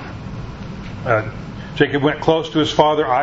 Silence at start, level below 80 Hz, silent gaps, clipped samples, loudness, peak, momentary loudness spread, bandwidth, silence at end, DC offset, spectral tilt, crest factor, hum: 0 s; -40 dBFS; none; under 0.1%; -17 LUFS; 0 dBFS; 16 LU; 8 kHz; 0 s; under 0.1%; -6 dB/octave; 18 dB; none